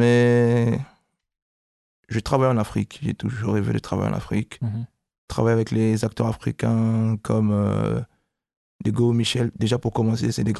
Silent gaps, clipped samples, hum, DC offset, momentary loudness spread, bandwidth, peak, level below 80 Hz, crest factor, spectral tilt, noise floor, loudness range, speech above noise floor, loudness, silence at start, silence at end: 1.42-2.03 s, 5.18-5.28 s, 8.57-8.79 s; under 0.1%; none; under 0.1%; 9 LU; 12.5 kHz; -6 dBFS; -46 dBFS; 16 dB; -7 dB/octave; -60 dBFS; 3 LU; 38 dB; -23 LUFS; 0 s; 0 s